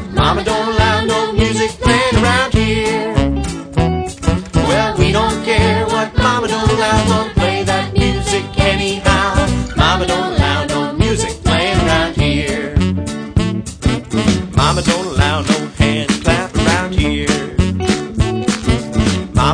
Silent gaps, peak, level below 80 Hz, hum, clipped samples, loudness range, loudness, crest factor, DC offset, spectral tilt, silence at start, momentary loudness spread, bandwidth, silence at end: none; 0 dBFS; -24 dBFS; none; under 0.1%; 2 LU; -15 LUFS; 14 dB; under 0.1%; -5 dB/octave; 0 s; 4 LU; 10.5 kHz; 0 s